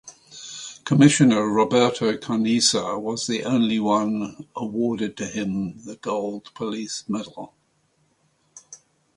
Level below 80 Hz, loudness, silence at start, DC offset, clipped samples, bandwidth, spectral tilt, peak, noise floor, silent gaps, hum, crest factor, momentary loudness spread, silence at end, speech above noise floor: -62 dBFS; -22 LUFS; 0.05 s; under 0.1%; under 0.1%; 11.5 kHz; -4.5 dB/octave; -2 dBFS; -66 dBFS; none; none; 22 dB; 17 LU; 0.4 s; 44 dB